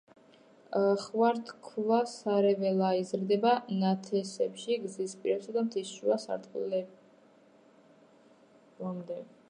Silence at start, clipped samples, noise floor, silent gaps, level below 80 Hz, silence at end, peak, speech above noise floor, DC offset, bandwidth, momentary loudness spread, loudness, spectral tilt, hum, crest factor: 0.7 s; under 0.1%; -61 dBFS; none; -86 dBFS; 0.25 s; -14 dBFS; 31 dB; under 0.1%; 10.5 kHz; 11 LU; -31 LUFS; -6 dB/octave; none; 18 dB